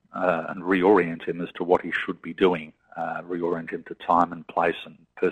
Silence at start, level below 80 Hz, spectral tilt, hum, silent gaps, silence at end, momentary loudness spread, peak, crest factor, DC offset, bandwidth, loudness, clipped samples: 0.15 s; -60 dBFS; -7.5 dB/octave; none; none; 0 s; 12 LU; -4 dBFS; 20 dB; under 0.1%; 9 kHz; -25 LUFS; under 0.1%